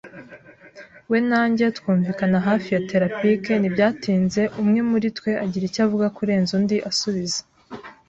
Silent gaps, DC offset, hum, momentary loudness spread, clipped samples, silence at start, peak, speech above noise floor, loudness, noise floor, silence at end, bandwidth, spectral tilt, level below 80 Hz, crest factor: none; under 0.1%; none; 6 LU; under 0.1%; 0.05 s; -4 dBFS; 25 dB; -21 LUFS; -46 dBFS; 0.15 s; 8.2 kHz; -5.5 dB/octave; -58 dBFS; 16 dB